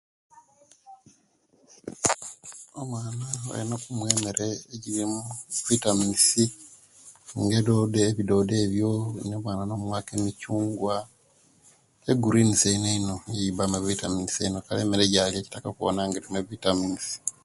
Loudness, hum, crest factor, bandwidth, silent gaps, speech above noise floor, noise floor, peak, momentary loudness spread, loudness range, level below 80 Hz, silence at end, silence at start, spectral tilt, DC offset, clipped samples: -26 LUFS; none; 26 dB; 12 kHz; none; 39 dB; -65 dBFS; -2 dBFS; 12 LU; 7 LU; -54 dBFS; 0.15 s; 0.85 s; -4 dB/octave; under 0.1%; under 0.1%